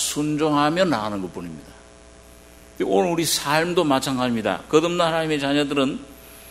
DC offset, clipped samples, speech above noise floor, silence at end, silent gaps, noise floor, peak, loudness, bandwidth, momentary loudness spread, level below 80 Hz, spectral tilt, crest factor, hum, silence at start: under 0.1%; under 0.1%; 25 dB; 0 s; none; -46 dBFS; -2 dBFS; -21 LUFS; 16 kHz; 15 LU; -52 dBFS; -4 dB/octave; 20 dB; none; 0 s